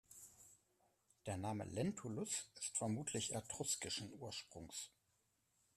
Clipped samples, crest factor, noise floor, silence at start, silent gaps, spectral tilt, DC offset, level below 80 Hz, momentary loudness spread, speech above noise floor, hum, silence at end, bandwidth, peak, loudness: under 0.1%; 18 dB; -82 dBFS; 0.1 s; none; -3.5 dB/octave; under 0.1%; -76 dBFS; 16 LU; 37 dB; none; 0.9 s; 15 kHz; -28 dBFS; -45 LUFS